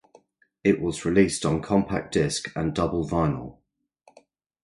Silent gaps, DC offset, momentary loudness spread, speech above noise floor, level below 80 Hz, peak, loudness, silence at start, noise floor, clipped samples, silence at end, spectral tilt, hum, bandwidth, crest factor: none; under 0.1%; 6 LU; 38 dB; -46 dBFS; -6 dBFS; -25 LUFS; 0.65 s; -62 dBFS; under 0.1%; 1.1 s; -5.5 dB/octave; none; 11.5 kHz; 20 dB